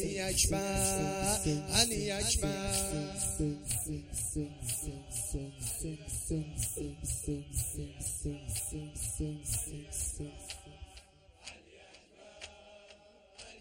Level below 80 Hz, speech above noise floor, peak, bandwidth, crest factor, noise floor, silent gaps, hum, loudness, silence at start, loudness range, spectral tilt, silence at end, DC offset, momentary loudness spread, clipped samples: -46 dBFS; 23 dB; -12 dBFS; 16.5 kHz; 24 dB; -59 dBFS; none; none; -34 LUFS; 0 s; 11 LU; -3 dB/octave; 0 s; under 0.1%; 20 LU; under 0.1%